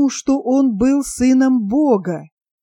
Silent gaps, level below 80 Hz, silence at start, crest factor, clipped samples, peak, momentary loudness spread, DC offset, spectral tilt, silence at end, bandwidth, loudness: none; -46 dBFS; 0 s; 12 dB; under 0.1%; -4 dBFS; 5 LU; under 0.1%; -5.5 dB/octave; 0.35 s; 12 kHz; -16 LUFS